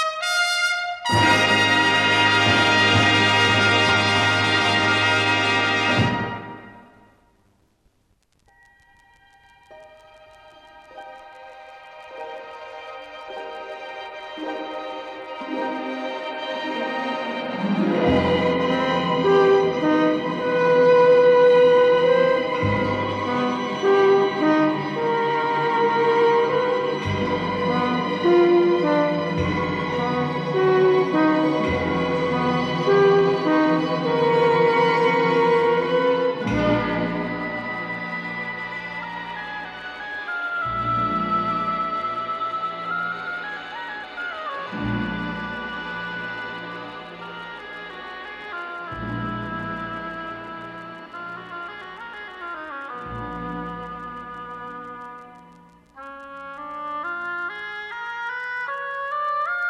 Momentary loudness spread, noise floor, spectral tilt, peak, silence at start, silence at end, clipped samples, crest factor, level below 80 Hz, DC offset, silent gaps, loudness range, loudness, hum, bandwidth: 19 LU; -65 dBFS; -5 dB/octave; -4 dBFS; 0 s; 0 s; under 0.1%; 18 dB; -52 dBFS; under 0.1%; none; 17 LU; -20 LUFS; none; 12 kHz